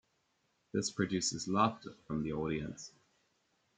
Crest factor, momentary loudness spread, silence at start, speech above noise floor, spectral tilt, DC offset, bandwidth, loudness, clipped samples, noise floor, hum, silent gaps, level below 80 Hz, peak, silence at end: 24 dB; 16 LU; 0.75 s; 42 dB; -4.5 dB/octave; under 0.1%; 9.6 kHz; -36 LUFS; under 0.1%; -78 dBFS; none; none; -64 dBFS; -14 dBFS; 0.9 s